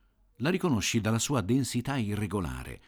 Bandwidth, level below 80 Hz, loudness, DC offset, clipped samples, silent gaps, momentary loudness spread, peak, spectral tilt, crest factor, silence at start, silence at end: over 20 kHz; -50 dBFS; -29 LUFS; under 0.1%; under 0.1%; none; 6 LU; -14 dBFS; -5 dB/octave; 16 dB; 0.4 s; 0.1 s